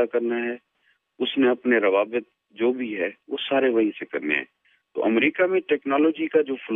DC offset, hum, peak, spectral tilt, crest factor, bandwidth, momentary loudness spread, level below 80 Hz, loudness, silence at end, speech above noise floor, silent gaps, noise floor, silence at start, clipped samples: under 0.1%; none; -6 dBFS; -7.5 dB/octave; 16 dB; 3.9 kHz; 10 LU; -82 dBFS; -23 LUFS; 0 s; 45 dB; none; -68 dBFS; 0 s; under 0.1%